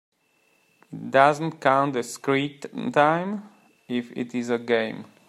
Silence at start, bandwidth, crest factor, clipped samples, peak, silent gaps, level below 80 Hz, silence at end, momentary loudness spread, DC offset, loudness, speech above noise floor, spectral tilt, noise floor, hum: 0.9 s; 14 kHz; 22 dB; under 0.1%; -2 dBFS; none; -72 dBFS; 0.25 s; 13 LU; under 0.1%; -24 LUFS; 42 dB; -5.5 dB/octave; -66 dBFS; none